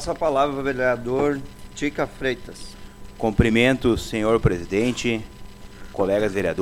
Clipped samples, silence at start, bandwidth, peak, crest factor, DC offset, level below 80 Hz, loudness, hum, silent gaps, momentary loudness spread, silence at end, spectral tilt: under 0.1%; 0 s; 16.5 kHz; -2 dBFS; 20 dB; under 0.1%; -38 dBFS; -22 LUFS; none; none; 15 LU; 0 s; -6 dB/octave